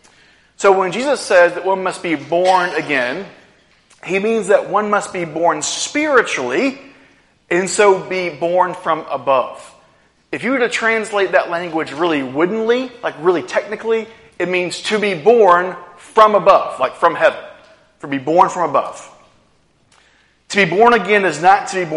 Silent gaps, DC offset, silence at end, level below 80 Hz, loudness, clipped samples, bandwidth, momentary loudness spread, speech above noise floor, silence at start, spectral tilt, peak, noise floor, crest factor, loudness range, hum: none; under 0.1%; 0 s; -60 dBFS; -16 LUFS; under 0.1%; 11.5 kHz; 11 LU; 41 dB; 0.6 s; -4 dB/octave; 0 dBFS; -56 dBFS; 16 dB; 4 LU; none